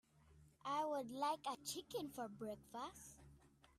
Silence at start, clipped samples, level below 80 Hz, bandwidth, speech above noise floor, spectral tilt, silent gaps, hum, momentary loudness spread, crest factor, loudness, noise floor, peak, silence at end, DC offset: 0.25 s; under 0.1%; -76 dBFS; 15.5 kHz; 21 dB; -3.5 dB/octave; none; none; 12 LU; 18 dB; -46 LUFS; -69 dBFS; -30 dBFS; 0.3 s; under 0.1%